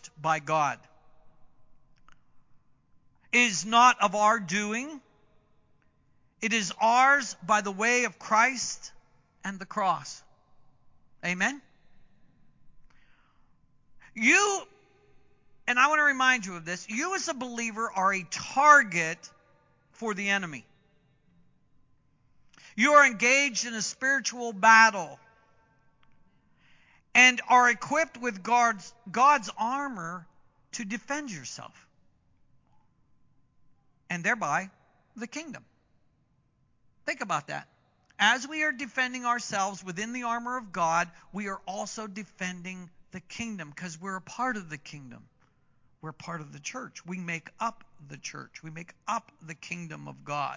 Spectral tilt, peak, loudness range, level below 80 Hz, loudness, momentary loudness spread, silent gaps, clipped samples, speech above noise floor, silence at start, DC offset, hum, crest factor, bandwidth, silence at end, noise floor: -2.5 dB/octave; -4 dBFS; 14 LU; -72 dBFS; -26 LUFS; 21 LU; none; under 0.1%; 42 dB; 0.05 s; under 0.1%; none; 24 dB; 7.8 kHz; 0 s; -69 dBFS